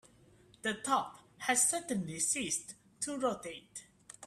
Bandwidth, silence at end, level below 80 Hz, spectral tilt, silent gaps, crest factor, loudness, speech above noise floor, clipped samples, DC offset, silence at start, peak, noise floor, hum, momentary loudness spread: 15.5 kHz; 0 s; -72 dBFS; -2 dB/octave; none; 20 dB; -34 LUFS; 28 dB; under 0.1%; under 0.1%; 0.65 s; -16 dBFS; -63 dBFS; none; 20 LU